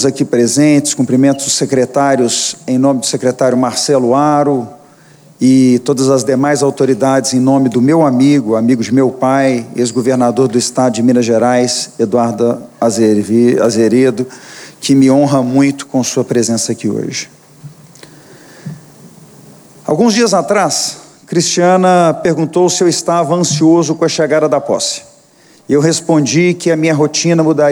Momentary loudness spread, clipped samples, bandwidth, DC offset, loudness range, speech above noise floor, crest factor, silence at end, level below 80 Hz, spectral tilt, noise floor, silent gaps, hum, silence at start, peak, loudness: 7 LU; under 0.1%; over 20 kHz; under 0.1%; 5 LU; 34 dB; 12 dB; 0 s; -60 dBFS; -5 dB/octave; -45 dBFS; none; none; 0 s; 0 dBFS; -12 LUFS